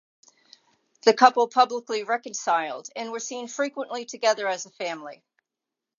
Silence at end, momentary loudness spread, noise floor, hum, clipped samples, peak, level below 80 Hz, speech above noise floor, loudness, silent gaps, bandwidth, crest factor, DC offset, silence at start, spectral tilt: 0.85 s; 15 LU; -87 dBFS; none; under 0.1%; -2 dBFS; -86 dBFS; 63 dB; -24 LUFS; none; 7.6 kHz; 24 dB; under 0.1%; 1.05 s; -1.5 dB/octave